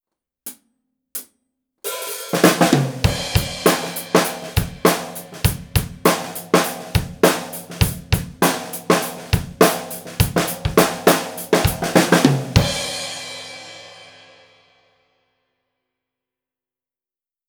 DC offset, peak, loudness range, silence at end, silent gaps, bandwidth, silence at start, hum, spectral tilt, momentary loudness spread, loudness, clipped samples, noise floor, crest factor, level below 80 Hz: under 0.1%; 0 dBFS; 4 LU; 3.45 s; none; over 20 kHz; 0.45 s; none; -4.5 dB/octave; 16 LU; -19 LUFS; under 0.1%; under -90 dBFS; 20 dB; -36 dBFS